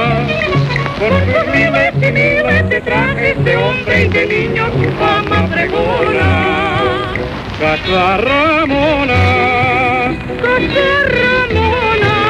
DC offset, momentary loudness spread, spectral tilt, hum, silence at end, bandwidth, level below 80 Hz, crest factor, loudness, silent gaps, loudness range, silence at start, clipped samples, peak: under 0.1%; 4 LU; -6.5 dB/octave; none; 0 s; 11 kHz; -32 dBFS; 10 dB; -12 LUFS; none; 2 LU; 0 s; under 0.1%; -2 dBFS